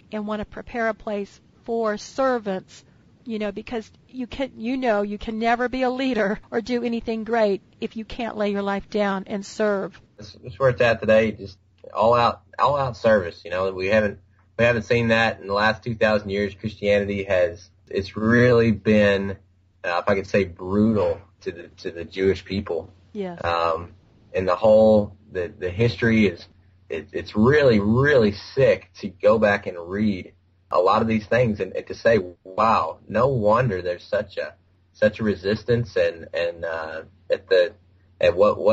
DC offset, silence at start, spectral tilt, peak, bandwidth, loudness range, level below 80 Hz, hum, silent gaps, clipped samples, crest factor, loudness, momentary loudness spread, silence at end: under 0.1%; 0.1 s; -5 dB/octave; -6 dBFS; 8 kHz; 6 LU; -52 dBFS; none; none; under 0.1%; 16 dB; -22 LUFS; 14 LU; 0 s